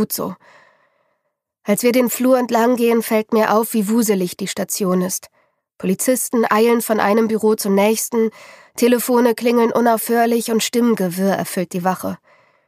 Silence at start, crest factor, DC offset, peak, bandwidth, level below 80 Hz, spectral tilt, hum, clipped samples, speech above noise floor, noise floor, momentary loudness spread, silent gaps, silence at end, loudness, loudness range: 0 s; 16 dB; under 0.1%; -2 dBFS; 15.5 kHz; -68 dBFS; -4.5 dB/octave; none; under 0.1%; 57 dB; -74 dBFS; 8 LU; none; 0.5 s; -17 LUFS; 2 LU